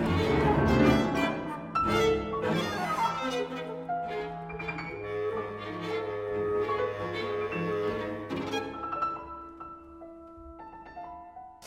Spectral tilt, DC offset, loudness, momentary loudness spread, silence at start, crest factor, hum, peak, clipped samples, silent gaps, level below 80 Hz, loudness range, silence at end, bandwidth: -6 dB/octave; under 0.1%; -30 LUFS; 20 LU; 0 s; 20 dB; none; -10 dBFS; under 0.1%; none; -48 dBFS; 9 LU; 0 s; 16 kHz